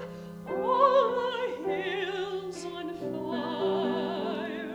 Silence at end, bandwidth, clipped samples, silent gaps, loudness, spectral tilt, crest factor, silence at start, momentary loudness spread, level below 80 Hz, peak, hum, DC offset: 0 s; 14 kHz; under 0.1%; none; -29 LUFS; -5.5 dB/octave; 20 dB; 0 s; 14 LU; -66 dBFS; -10 dBFS; none; under 0.1%